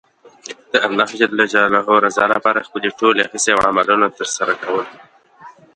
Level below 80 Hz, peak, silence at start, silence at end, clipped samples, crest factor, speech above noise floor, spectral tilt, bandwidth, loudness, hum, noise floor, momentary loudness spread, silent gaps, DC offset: -56 dBFS; 0 dBFS; 0.25 s; 0.25 s; under 0.1%; 18 dB; 27 dB; -2.5 dB/octave; 11.5 kHz; -16 LUFS; none; -43 dBFS; 9 LU; none; under 0.1%